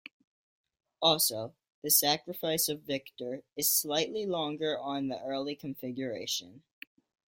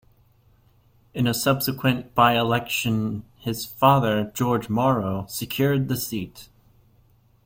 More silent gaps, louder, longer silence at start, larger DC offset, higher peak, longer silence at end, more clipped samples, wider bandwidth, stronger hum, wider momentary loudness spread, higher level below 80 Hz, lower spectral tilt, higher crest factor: first, 1.74-1.82 s vs none; second, -30 LUFS vs -23 LUFS; second, 1 s vs 1.15 s; neither; second, -10 dBFS vs -4 dBFS; second, 0.7 s vs 1 s; neither; about the same, 16.5 kHz vs 16.5 kHz; neither; first, 14 LU vs 11 LU; second, -74 dBFS vs -54 dBFS; second, -2 dB/octave vs -5.5 dB/octave; about the same, 22 dB vs 20 dB